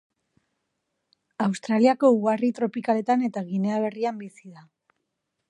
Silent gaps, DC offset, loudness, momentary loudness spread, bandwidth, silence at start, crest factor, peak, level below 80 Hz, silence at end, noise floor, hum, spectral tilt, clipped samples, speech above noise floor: none; under 0.1%; -24 LUFS; 10 LU; 10.5 kHz; 1.4 s; 20 dB; -6 dBFS; -78 dBFS; 0.9 s; -80 dBFS; none; -7 dB/octave; under 0.1%; 56 dB